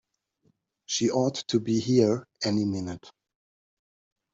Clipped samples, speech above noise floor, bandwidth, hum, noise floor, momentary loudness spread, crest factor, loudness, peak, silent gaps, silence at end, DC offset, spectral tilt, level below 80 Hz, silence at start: under 0.1%; 45 dB; 8 kHz; none; -70 dBFS; 10 LU; 20 dB; -26 LUFS; -8 dBFS; none; 1.25 s; under 0.1%; -5.5 dB/octave; -68 dBFS; 0.9 s